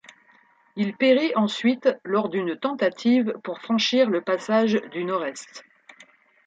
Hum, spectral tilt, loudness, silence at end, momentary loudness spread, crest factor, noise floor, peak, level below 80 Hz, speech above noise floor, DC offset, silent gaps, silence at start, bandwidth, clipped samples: none; -5 dB/octave; -23 LUFS; 0.85 s; 9 LU; 18 dB; -58 dBFS; -6 dBFS; -74 dBFS; 36 dB; under 0.1%; none; 0.75 s; 9 kHz; under 0.1%